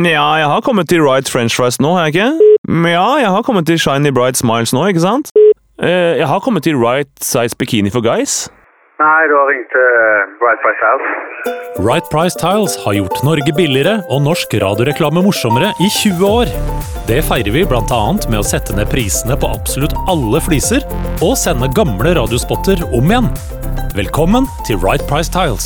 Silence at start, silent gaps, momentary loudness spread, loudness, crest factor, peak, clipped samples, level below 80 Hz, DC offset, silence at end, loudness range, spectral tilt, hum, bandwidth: 0 s; 2.58-2.64 s, 5.31-5.35 s; 6 LU; -13 LUFS; 12 dB; 0 dBFS; under 0.1%; -26 dBFS; under 0.1%; 0 s; 3 LU; -4.5 dB/octave; none; over 20 kHz